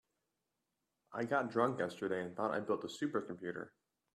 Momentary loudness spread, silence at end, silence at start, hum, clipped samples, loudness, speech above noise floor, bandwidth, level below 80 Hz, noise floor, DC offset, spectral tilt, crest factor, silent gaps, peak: 11 LU; 0.45 s; 1.1 s; none; under 0.1%; -39 LUFS; 50 dB; 13 kHz; -82 dBFS; -87 dBFS; under 0.1%; -6 dB/octave; 22 dB; none; -18 dBFS